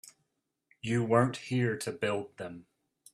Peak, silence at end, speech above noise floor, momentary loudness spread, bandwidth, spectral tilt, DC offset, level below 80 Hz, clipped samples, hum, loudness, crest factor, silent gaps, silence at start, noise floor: -10 dBFS; 0.55 s; 51 dB; 17 LU; 14 kHz; -6 dB/octave; under 0.1%; -70 dBFS; under 0.1%; none; -31 LUFS; 22 dB; none; 0.85 s; -82 dBFS